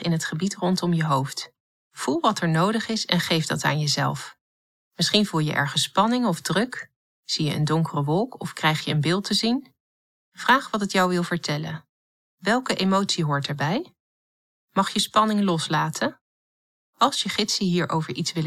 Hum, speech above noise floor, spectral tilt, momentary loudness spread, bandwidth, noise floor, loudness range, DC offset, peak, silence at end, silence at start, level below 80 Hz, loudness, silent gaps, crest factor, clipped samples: none; over 67 dB; -4.5 dB/octave; 9 LU; 15.5 kHz; under -90 dBFS; 2 LU; under 0.1%; -2 dBFS; 0 s; 0 s; -66 dBFS; -23 LUFS; 1.60-1.91 s, 4.41-4.91 s, 6.96-7.23 s, 9.80-10.32 s, 11.89-12.38 s, 14.00-14.68 s, 16.21-16.93 s; 22 dB; under 0.1%